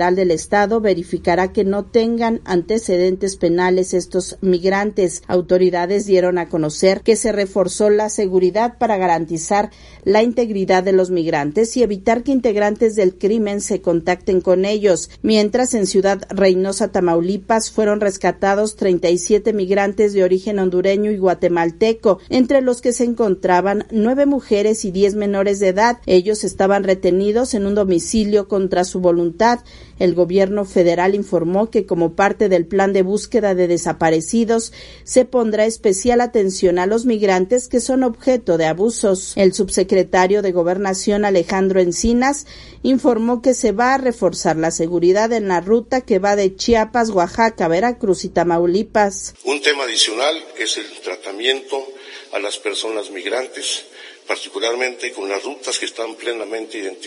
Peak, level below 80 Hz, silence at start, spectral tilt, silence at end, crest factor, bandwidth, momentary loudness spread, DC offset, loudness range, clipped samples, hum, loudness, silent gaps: 0 dBFS; -44 dBFS; 0 s; -4.5 dB/octave; 0 s; 16 dB; 11.5 kHz; 7 LU; under 0.1%; 2 LU; under 0.1%; none; -17 LUFS; none